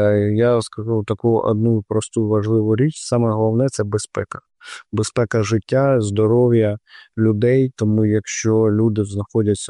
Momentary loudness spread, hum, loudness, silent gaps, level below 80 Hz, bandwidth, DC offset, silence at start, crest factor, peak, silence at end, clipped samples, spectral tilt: 8 LU; none; -18 LUFS; none; -54 dBFS; 11 kHz; under 0.1%; 0 s; 12 dB; -6 dBFS; 0 s; under 0.1%; -7 dB/octave